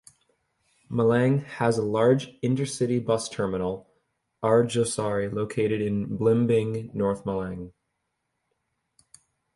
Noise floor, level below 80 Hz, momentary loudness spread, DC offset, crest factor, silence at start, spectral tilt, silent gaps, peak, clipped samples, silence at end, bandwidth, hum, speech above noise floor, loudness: -79 dBFS; -56 dBFS; 9 LU; under 0.1%; 18 dB; 0.9 s; -6.5 dB/octave; none; -8 dBFS; under 0.1%; 1.85 s; 11.5 kHz; none; 54 dB; -25 LUFS